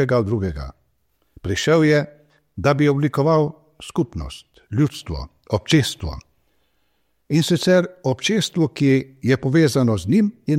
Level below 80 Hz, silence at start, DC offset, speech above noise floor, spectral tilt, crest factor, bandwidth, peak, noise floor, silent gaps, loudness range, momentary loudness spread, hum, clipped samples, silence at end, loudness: -42 dBFS; 0 s; under 0.1%; 50 dB; -6 dB/octave; 16 dB; 15.5 kHz; -4 dBFS; -69 dBFS; none; 5 LU; 16 LU; none; under 0.1%; 0 s; -19 LUFS